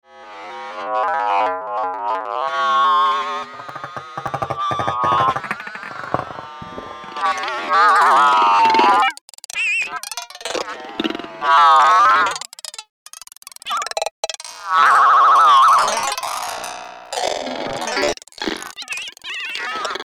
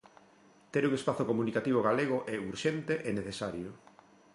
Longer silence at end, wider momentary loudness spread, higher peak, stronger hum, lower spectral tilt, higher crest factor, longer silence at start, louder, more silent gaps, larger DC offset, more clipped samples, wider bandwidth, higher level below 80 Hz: second, 0 s vs 0.6 s; first, 20 LU vs 9 LU; first, 0 dBFS vs -14 dBFS; neither; second, -2 dB/octave vs -6 dB/octave; about the same, 18 dB vs 18 dB; second, 0.15 s vs 0.75 s; first, -17 LUFS vs -32 LUFS; first, 9.21-9.28 s, 12.89-13.06 s, 13.38-13.42 s, 14.11-14.23 s vs none; neither; neither; first, 16 kHz vs 11.5 kHz; first, -58 dBFS vs -66 dBFS